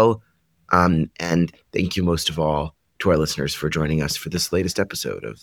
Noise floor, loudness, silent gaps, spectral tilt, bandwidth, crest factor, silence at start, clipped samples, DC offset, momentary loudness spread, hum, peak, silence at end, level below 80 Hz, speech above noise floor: -58 dBFS; -22 LUFS; none; -5 dB/octave; 18 kHz; 22 dB; 0 s; under 0.1%; under 0.1%; 7 LU; none; 0 dBFS; 0.1 s; -42 dBFS; 37 dB